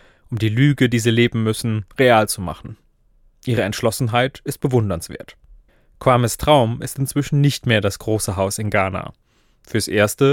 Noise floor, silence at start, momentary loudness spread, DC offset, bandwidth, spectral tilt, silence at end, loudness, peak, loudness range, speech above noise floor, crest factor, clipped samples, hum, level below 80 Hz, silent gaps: -55 dBFS; 0.3 s; 13 LU; under 0.1%; 17.5 kHz; -5.5 dB/octave; 0 s; -19 LUFS; 0 dBFS; 4 LU; 37 dB; 18 dB; under 0.1%; none; -44 dBFS; none